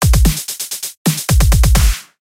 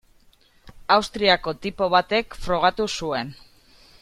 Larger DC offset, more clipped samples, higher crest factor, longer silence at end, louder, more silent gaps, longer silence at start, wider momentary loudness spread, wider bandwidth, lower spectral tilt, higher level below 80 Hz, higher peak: neither; neither; second, 12 dB vs 22 dB; second, 0.2 s vs 0.65 s; first, -15 LUFS vs -22 LUFS; first, 0.97-1.05 s vs none; second, 0 s vs 0.65 s; about the same, 9 LU vs 10 LU; first, 16.5 kHz vs 14.5 kHz; about the same, -4 dB/octave vs -4 dB/octave; first, -14 dBFS vs -46 dBFS; about the same, 0 dBFS vs -2 dBFS